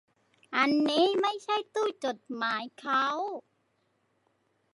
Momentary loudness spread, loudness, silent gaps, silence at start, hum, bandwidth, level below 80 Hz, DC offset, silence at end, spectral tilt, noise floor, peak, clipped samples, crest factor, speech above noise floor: 10 LU; -29 LUFS; none; 0.5 s; none; 11.5 kHz; -86 dBFS; under 0.1%; 1.35 s; -3.5 dB/octave; -74 dBFS; -10 dBFS; under 0.1%; 22 dB; 45 dB